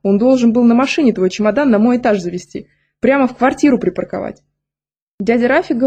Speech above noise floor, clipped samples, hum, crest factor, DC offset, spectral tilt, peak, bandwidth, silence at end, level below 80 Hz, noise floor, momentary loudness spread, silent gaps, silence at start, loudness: over 77 dB; under 0.1%; none; 12 dB; under 0.1%; -6 dB/octave; -2 dBFS; 8.8 kHz; 0 s; -50 dBFS; under -90 dBFS; 13 LU; 5.02-5.18 s; 0.05 s; -14 LUFS